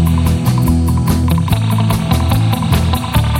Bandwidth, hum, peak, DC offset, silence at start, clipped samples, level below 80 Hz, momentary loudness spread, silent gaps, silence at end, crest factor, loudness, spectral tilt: 17 kHz; none; 0 dBFS; under 0.1%; 0 s; under 0.1%; -22 dBFS; 1 LU; none; 0 s; 12 dB; -14 LUFS; -6.5 dB/octave